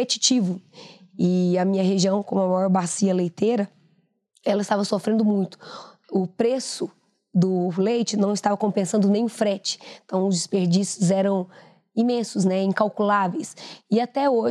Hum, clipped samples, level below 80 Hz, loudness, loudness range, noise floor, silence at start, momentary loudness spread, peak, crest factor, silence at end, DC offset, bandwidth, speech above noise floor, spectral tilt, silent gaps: none; under 0.1%; -82 dBFS; -23 LUFS; 3 LU; -65 dBFS; 0 s; 11 LU; -4 dBFS; 18 dB; 0 s; under 0.1%; 11.5 kHz; 43 dB; -5.5 dB/octave; none